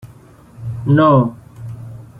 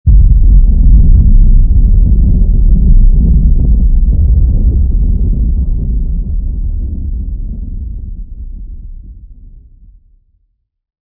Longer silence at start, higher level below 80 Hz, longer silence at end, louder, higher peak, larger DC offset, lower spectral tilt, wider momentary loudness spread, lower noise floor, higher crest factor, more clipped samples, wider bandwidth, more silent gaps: about the same, 0.05 s vs 0.05 s; second, -46 dBFS vs -8 dBFS; second, 0 s vs 1.8 s; about the same, -14 LUFS vs -12 LUFS; about the same, -2 dBFS vs 0 dBFS; neither; second, -9.5 dB/octave vs -15 dB/octave; first, 22 LU vs 18 LU; second, -43 dBFS vs -60 dBFS; first, 16 dB vs 8 dB; second, under 0.1% vs 2%; first, 4.9 kHz vs 0.8 kHz; neither